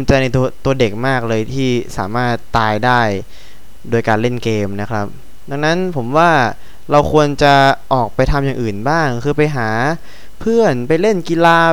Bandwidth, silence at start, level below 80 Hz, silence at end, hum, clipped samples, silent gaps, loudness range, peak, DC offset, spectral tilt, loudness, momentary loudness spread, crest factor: 19 kHz; 0 s; -32 dBFS; 0 s; none; under 0.1%; none; 4 LU; 0 dBFS; 6%; -6 dB/octave; -15 LUFS; 9 LU; 14 dB